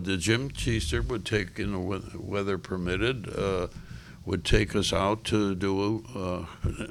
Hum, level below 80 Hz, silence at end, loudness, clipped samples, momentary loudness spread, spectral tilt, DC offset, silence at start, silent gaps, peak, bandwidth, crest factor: none; -38 dBFS; 0 s; -29 LUFS; under 0.1%; 8 LU; -5 dB/octave; under 0.1%; 0 s; none; -8 dBFS; 15 kHz; 20 dB